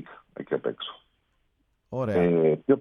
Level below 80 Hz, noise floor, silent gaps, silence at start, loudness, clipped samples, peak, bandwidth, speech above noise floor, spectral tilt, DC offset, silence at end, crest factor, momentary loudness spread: -58 dBFS; -71 dBFS; none; 0 s; -25 LUFS; under 0.1%; -10 dBFS; 5.6 kHz; 47 dB; -9 dB/octave; under 0.1%; 0 s; 18 dB; 18 LU